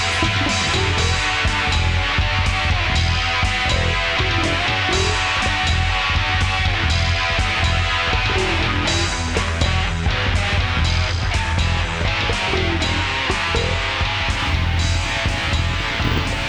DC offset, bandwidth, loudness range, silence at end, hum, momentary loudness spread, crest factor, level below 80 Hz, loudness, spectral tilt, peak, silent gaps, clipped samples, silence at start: 0.5%; 11 kHz; 2 LU; 0 s; none; 2 LU; 16 dB; -26 dBFS; -18 LUFS; -4 dB/octave; -4 dBFS; none; under 0.1%; 0 s